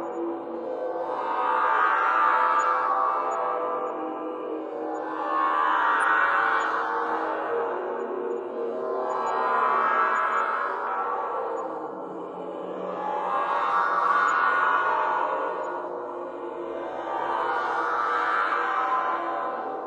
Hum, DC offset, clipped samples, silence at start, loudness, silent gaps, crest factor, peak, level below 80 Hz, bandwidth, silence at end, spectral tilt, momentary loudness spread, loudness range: none; under 0.1%; under 0.1%; 0 s; -26 LUFS; none; 16 dB; -10 dBFS; -76 dBFS; 10 kHz; 0 s; -4 dB/octave; 11 LU; 4 LU